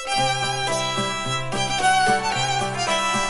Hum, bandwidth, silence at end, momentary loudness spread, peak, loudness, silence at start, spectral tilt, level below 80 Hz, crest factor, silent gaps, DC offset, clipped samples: none; 11.5 kHz; 0 s; 5 LU; -8 dBFS; -21 LUFS; 0 s; -2.5 dB/octave; -48 dBFS; 14 dB; none; 0.8%; under 0.1%